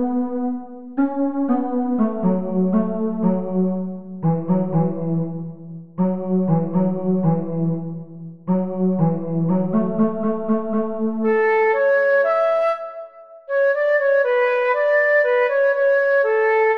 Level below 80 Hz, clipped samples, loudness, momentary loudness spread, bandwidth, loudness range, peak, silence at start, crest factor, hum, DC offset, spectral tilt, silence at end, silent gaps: -62 dBFS; under 0.1%; -20 LUFS; 11 LU; 5.4 kHz; 4 LU; -8 dBFS; 0 s; 12 dB; none; 1%; -10 dB/octave; 0 s; none